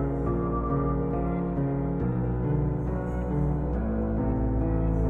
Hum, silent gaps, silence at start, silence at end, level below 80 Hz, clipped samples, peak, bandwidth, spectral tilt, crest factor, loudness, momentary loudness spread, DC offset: none; none; 0 s; 0 s; -32 dBFS; under 0.1%; -16 dBFS; 3 kHz; -12 dB/octave; 10 dB; -28 LUFS; 2 LU; under 0.1%